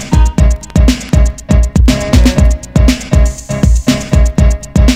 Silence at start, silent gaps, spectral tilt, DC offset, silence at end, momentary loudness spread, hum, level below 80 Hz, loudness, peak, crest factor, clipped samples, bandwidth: 0 s; none; -6 dB/octave; under 0.1%; 0 s; 3 LU; none; -10 dBFS; -11 LUFS; 0 dBFS; 8 dB; 2%; 14 kHz